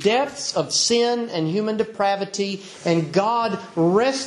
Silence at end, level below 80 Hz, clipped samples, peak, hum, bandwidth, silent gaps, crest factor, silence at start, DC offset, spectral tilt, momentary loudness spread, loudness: 0 s; -66 dBFS; under 0.1%; -6 dBFS; none; 11.5 kHz; none; 16 dB; 0 s; under 0.1%; -4 dB/octave; 7 LU; -21 LUFS